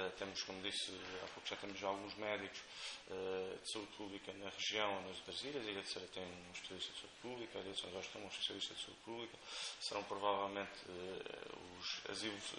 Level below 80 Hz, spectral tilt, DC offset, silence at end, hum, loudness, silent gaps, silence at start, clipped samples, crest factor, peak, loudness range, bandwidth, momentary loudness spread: -76 dBFS; -2.5 dB/octave; under 0.1%; 0 s; none; -45 LUFS; none; 0 s; under 0.1%; 22 dB; -24 dBFS; 2 LU; 10 kHz; 9 LU